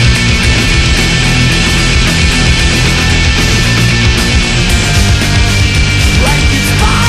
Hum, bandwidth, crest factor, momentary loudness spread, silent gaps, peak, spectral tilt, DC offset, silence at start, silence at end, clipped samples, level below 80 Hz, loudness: none; 14.5 kHz; 8 dB; 1 LU; none; 0 dBFS; -4 dB/octave; under 0.1%; 0 s; 0 s; under 0.1%; -14 dBFS; -9 LUFS